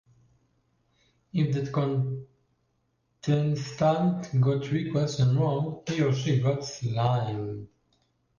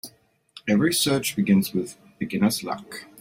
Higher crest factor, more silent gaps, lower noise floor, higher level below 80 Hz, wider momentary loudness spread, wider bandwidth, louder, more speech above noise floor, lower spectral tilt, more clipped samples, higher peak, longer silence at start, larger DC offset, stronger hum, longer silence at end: about the same, 14 dB vs 16 dB; neither; first, -73 dBFS vs -54 dBFS; about the same, -60 dBFS vs -60 dBFS; second, 9 LU vs 15 LU; second, 7.2 kHz vs 16.5 kHz; second, -27 LUFS vs -23 LUFS; first, 47 dB vs 31 dB; first, -7 dB/octave vs -4.5 dB/octave; neither; second, -14 dBFS vs -8 dBFS; first, 1.35 s vs 0.05 s; neither; neither; first, 0.7 s vs 0 s